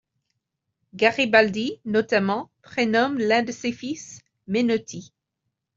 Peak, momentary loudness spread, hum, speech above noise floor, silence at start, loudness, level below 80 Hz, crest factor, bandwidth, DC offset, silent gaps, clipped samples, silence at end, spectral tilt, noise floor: -2 dBFS; 15 LU; none; 58 dB; 0.95 s; -22 LUFS; -66 dBFS; 22 dB; 7.6 kHz; under 0.1%; none; under 0.1%; 0.7 s; -4.5 dB/octave; -80 dBFS